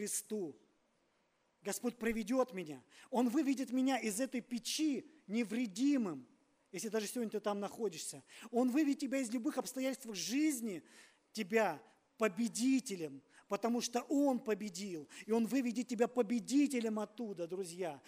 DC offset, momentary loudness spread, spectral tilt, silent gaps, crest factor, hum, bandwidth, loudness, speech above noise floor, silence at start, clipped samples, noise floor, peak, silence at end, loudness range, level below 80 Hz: under 0.1%; 11 LU; -4 dB/octave; none; 20 dB; none; 15.5 kHz; -37 LUFS; 41 dB; 0 s; under 0.1%; -78 dBFS; -18 dBFS; 0.1 s; 3 LU; -76 dBFS